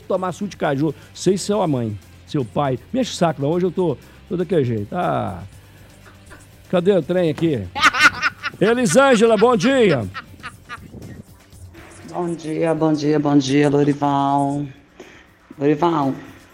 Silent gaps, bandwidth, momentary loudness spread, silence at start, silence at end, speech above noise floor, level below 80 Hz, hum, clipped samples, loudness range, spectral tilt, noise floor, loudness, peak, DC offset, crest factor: none; 15.5 kHz; 18 LU; 0.1 s; 0.2 s; 27 dB; -52 dBFS; none; under 0.1%; 7 LU; -5.5 dB/octave; -45 dBFS; -19 LUFS; -4 dBFS; under 0.1%; 16 dB